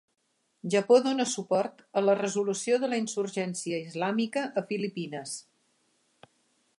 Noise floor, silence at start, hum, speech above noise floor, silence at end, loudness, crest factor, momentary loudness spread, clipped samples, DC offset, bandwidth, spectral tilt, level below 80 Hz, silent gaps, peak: -71 dBFS; 0.65 s; none; 43 dB; 1.35 s; -28 LUFS; 20 dB; 13 LU; under 0.1%; under 0.1%; 11.5 kHz; -4.5 dB/octave; -82 dBFS; none; -10 dBFS